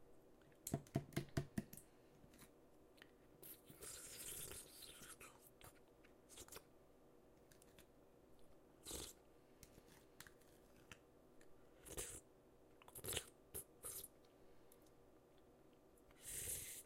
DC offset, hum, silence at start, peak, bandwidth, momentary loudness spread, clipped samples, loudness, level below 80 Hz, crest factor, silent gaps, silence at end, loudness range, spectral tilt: under 0.1%; none; 0 s; -26 dBFS; 16 kHz; 22 LU; under 0.1%; -52 LUFS; -70 dBFS; 30 dB; none; 0 s; 8 LU; -3.5 dB/octave